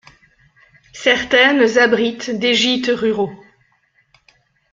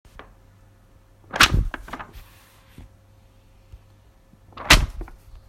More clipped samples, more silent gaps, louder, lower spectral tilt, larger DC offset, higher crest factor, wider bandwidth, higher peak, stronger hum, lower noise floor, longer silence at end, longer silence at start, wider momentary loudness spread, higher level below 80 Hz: neither; neither; first, -15 LUFS vs -18 LUFS; about the same, -3 dB/octave vs -2.5 dB/octave; neither; second, 18 dB vs 26 dB; second, 7.6 kHz vs 16 kHz; about the same, 0 dBFS vs 0 dBFS; neither; first, -60 dBFS vs -53 dBFS; first, 1.35 s vs 0.45 s; second, 0.95 s vs 1.35 s; second, 8 LU vs 25 LU; second, -56 dBFS vs -32 dBFS